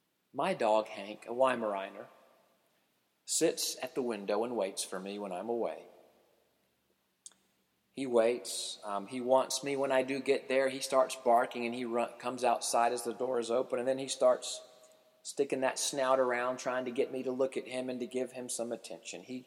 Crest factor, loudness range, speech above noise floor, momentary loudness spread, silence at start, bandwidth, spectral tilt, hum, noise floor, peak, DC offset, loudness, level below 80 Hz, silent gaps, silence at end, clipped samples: 20 dB; 6 LU; 44 dB; 12 LU; 0.35 s; 16.5 kHz; -3 dB/octave; none; -76 dBFS; -14 dBFS; under 0.1%; -33 LUFS; -88 dBFS; none; 0.05 s; under 0.1%